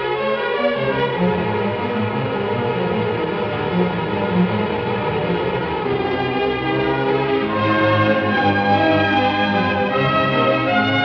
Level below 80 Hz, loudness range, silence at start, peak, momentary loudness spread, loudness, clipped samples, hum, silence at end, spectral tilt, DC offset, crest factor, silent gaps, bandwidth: -46 dBFS; 4 LU; 0 s; -4 dBFS; 5 LU; -19 LUFS; under 0.1%; none; 0 s; -8 dB/octave; under 0.1%; 14 dB; none; 6.4 kHz